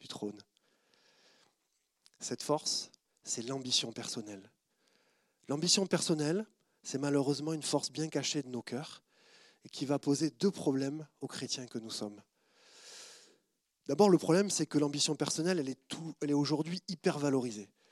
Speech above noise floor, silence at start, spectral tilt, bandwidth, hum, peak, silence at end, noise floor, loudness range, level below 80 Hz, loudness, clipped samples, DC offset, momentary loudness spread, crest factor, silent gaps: 47 dB; 0.05 s; -4 dB/octave; 14 kHz; none; -14 dBFS; 0.25 s; -80 dBFS; 7 LU; -88 dBFS; -34 LUFS; under 0.1%; under 0.1%; 19 LU; 22 dB; none